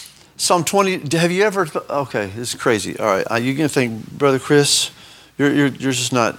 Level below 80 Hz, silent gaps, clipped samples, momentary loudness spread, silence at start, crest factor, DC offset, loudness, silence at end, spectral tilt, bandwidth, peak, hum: -58 dBFS; none; under 0.1%; 8 LU; 0 s; 18 dB; under 0.1%; -18 LUFS; 0 s; -4 dB/octave; 18 kHz; 0 dBFS; none